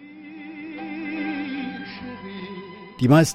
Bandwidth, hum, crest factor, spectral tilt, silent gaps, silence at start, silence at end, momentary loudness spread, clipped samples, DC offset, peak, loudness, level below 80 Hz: 15.5 kHz; none; 22 dB; -6 dB/octave; none; 0 s; 0 s; 18 LU; under 0.1%; under 0.1%; -4 dBFS; -27 LUFS; -60 dBFS